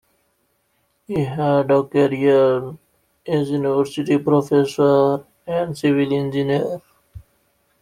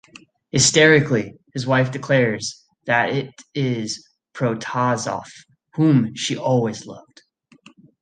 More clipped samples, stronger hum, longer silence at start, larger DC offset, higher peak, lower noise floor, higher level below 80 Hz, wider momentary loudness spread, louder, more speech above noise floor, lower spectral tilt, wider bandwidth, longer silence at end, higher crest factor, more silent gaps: neither; neither; first, 1.1 s vs 0.55 s; neither; about the same, -4 dBFS vs -2 dBFS; first, -66 dBFS vs -52 dBFS; about the same, -56 dBFS vs -58 dBFS; second, 11 LU vs 17 LU; about the same, -19 LUFS vs -19 LUFS; first, 49 dB vs 32 dB; first, -7.5 dB/octave vs -4.5 dB/octave; first, 13.5 kHz vs 9.6 kHz; second, 0.65 s vs 1 s; about the same, 16 dB vs 20 dB; neither